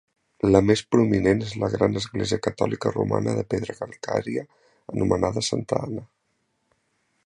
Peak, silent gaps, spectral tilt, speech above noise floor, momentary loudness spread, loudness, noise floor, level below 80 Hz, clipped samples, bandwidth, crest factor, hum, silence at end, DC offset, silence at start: -2 dBFS; none; -6 dB/octave; 49 dB; 12 LU; -24 LUFS; -73 dBFS; -48 dBFS; under 0.1%; 11 kHz; 22 dB; none; 1.2 s; under 0.1%; 0.45 s